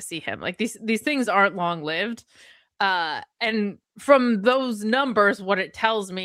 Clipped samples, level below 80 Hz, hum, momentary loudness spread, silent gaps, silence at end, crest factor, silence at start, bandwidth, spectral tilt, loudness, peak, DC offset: under 0.1%; -70 dBFS; none; 10 LU; none; 0 s; 22 dB; 0 s; 16 kHz; -4.5 dB/octave; -23 LUFS; -2 dBFS; under 0.1%